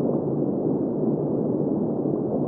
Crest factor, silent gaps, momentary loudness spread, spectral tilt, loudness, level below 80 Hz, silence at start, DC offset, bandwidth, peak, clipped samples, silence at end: 12 dB; none; 1 LU; -15 dB/octave; -25 LUFS; -58 dBFS; 0 s; under 0.1%; 1.9 kHz; -10 dBFS; under 0.1%; 0 s